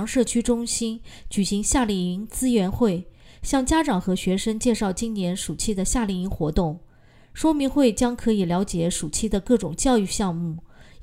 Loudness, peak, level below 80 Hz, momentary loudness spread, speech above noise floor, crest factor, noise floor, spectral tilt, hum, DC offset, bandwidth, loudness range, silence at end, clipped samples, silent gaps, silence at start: -23 LUFS; -6 dBFS; -38 dBFS; 8 LU; 28 dB; 16 dB; -51 dBFS; -5 dB/octave; none; under 0.1%; 16 kHz; 2 LU; 0 s; under 0.1%; none; 0 s